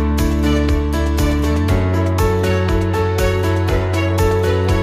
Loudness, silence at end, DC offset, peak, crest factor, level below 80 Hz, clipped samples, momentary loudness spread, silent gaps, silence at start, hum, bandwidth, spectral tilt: -17 LUFS; 0 s; under 0.1%; -4 dBFS; 12 dB; -22 dBFS; under 0.1%; 2 LU; none; 0 s; none; 16 kHz; -6.5 dB/octave